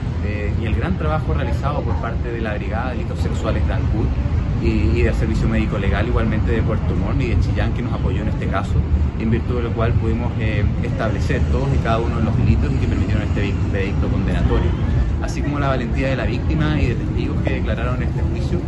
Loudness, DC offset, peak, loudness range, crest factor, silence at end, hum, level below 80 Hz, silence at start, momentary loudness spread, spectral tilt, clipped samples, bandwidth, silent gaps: -20 LUFS; under 0.1%; -2 dBFS; 2 LU; 16 dB; 0 s; none; -24 dBFS; 0 s; 4 LU; -8 dB/octave; under 0.1%; 8.2 kHz; none